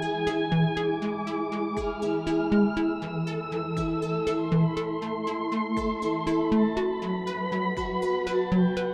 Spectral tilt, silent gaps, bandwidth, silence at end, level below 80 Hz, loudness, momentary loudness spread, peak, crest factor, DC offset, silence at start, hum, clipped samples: -7.5 dB/octave; none; 10 kHz; 0 s; -46 dBFS; -27 LUFS; 6 LU; -12 dBFS; 16 dB; under 0.1%; 0 s; none; under 0.1%